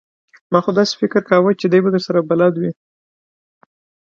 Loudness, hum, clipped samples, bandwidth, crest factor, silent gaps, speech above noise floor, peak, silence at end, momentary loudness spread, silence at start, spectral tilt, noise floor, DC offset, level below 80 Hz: -16 LUFS; none; under 0.1%; 7.4 kHz; 18 dB; none; over 75 dB; 0 dBFS; 1.4 s; 5 LU; 0.5 s; -6.5 dB/octave; under -90 dBFS; under 0.1%; -64 dBFS